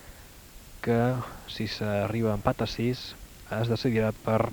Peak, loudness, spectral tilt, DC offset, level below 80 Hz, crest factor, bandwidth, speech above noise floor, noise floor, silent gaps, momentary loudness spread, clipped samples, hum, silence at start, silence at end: -6 dBFS; -29 LUFS; -6.5 dB/octave; under 0.1%; -48 dBFS; 22 dB; over 20 kHz; 21 dB; -48 dBFS; none; 22 LU; under 0.1%; none; 0 s; 0 s